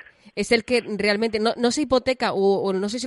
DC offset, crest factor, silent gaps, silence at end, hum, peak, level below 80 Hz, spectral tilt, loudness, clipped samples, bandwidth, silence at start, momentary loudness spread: under 0.1%; 16 dB; none; 0 s; none; -6 dBFS; -52 dBFS; -4 dB/octave; -22 LUFS; under 0.1%; 11.5 kHz; 0.35 s; 4 LU